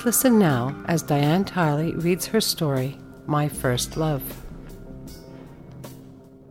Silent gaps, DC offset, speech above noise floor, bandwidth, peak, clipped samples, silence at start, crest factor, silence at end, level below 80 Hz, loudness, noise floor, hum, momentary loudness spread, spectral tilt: none; under 0.1%; 24 dB; 17 kHz; -6 dBFS; under 0.1%; 0 s; 18 dB; 0 s; -46 dBFS; -23 LUFS; -45 dBFS; none; 23 LU; -5 dB/octave